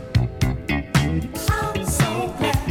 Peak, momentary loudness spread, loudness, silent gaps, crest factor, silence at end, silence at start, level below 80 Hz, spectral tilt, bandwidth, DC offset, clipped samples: -4 dBFS; 3 LU; -22 LUFS; none; 16 dB; 0 s; 0 s; -30 dBFS; -5 dB/octave; 18.5 kHz; under 0.1%; under 0.1%